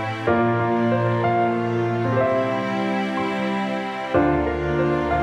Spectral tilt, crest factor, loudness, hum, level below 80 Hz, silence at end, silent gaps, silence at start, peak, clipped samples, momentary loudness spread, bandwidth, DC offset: -8 dB/octave; 14 dB; -22 LUFS; none; -42 dBFS; 0 s; none; 0 s; -6 dBFS; under 0.1%; 4 LU; 9.6 kHz; under 0.1%